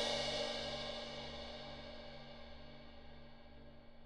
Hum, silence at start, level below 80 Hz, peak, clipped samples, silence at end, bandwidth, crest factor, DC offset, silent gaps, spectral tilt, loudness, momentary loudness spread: none; 0 s; -58 dBFS; -28 dBFS; under 0.1%; 0 s; 12.5 kHz; 18 dB; under 0.1%; none; -3 dB/octave; -44 LUFS; 21 LU